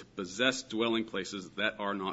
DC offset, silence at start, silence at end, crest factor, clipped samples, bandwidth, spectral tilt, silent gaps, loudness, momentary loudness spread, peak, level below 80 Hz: under 0.1%; 0 s; 0 s; 22 dB; under 0.1%; 8 kHz; -2 dB/octave; none; -33 LUFS; 8 LU; -12 dBFS; -70 dBFS